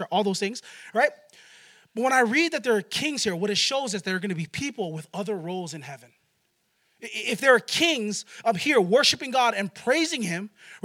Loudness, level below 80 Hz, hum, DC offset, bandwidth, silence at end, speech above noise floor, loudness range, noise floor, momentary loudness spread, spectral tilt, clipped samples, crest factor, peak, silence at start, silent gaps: -24 LUFS; -74 dBFS; none; under 0.1%; 16.5 kHz; 0.05 s; 46 dB; 8 LU; -71 dBFS; 14 LU; -3 dB/octave; under 0.1%; 20 dB; -6 dBFS; 0 s; none